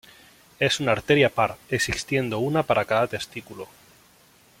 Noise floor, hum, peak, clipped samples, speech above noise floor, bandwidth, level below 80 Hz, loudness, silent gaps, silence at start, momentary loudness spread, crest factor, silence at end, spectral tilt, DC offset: -56 dBFS; none; -4 dBFS; under 0.1%; 33 dB; 16.5 kHz; -52 dBFS; -23 LUFS; none; 0.6 s; 17 LU; 22 dB; 0.95 s; -4.5 dB/octave; under 0.1%